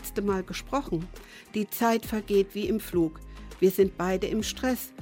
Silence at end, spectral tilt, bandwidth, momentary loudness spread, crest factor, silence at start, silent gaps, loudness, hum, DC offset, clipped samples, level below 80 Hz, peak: 0 s; -5 dB/octave; 17 kHz; 9 LU; 18 dB; 0 s; none; -28 LUFS; none; under 0.1%; under 0.1%; -46 dBFS; -10 dBFS